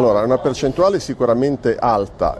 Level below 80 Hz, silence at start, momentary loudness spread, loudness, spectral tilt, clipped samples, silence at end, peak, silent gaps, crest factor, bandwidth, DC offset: -40 dBFS; 0 s; 2 LU; -17 LUFS; -6.5 dB/octave; under 0.1%; 0 s; -4 dBFS; none; 14 dB; 12 kHz; under 0.1%